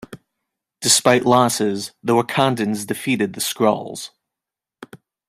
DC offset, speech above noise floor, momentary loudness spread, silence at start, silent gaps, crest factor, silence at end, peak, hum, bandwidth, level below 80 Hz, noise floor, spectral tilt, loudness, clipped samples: under 0.1%; 68 dB; 11 LU; 0 s; none; 18 dB; 0.3 s; -2 dBFS; none; 16 kHz; -62 dBFS; -87 dBFS; -3.5 dB/octave; -18 LUFS; under 0.1%